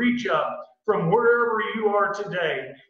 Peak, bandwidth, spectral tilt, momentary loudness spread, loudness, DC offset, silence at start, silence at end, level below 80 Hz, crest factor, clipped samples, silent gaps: -8 dBFS; 7.2 kHz; -6.5 dB/octave; 7 LU; -23 LUFS; under 0.1%; 0 s; 0.15 s; -66 dBFS; 16 dB; under 0.1%; none